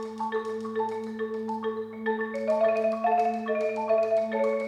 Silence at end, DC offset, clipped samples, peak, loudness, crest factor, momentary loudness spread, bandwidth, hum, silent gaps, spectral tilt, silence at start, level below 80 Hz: 0 s; under 0.1%; under 0.1%; -14 dBFS; -28 LUFS; 14 dB; 8 LU; 10 kHz; none; none; -6 dB/octave; 0 s; -74 dBFS